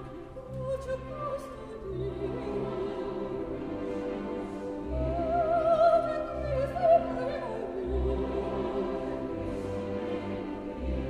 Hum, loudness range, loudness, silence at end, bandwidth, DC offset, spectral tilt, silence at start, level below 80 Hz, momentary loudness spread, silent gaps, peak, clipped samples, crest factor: none; 8 LU; -31 LUFS; 0 s; 10.5 kHz; under 0.1%; -8 dB/octave; 0 s; -42 dBFS; 12 LU; none; -12 dBFS; under 0.1%; 18 dB